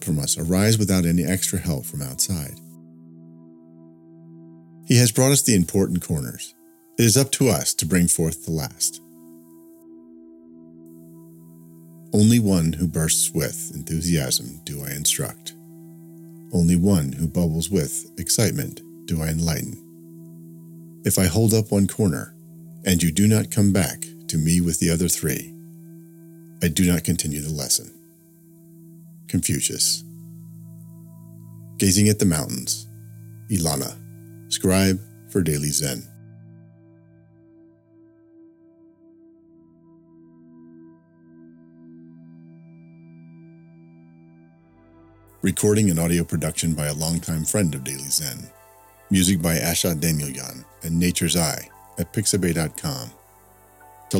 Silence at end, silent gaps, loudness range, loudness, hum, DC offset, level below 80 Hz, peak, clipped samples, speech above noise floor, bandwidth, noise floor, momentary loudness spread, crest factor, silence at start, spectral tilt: 0 s; none; 6 LU; -21 LUFS; none; under 0.1%; -46 dBFS; -2 dBFS; under 0.1%; 33 dB; 17.5 kHz; -54 dBFS; 23 LU; 22 dB; 0 s; -4.5 dB/octave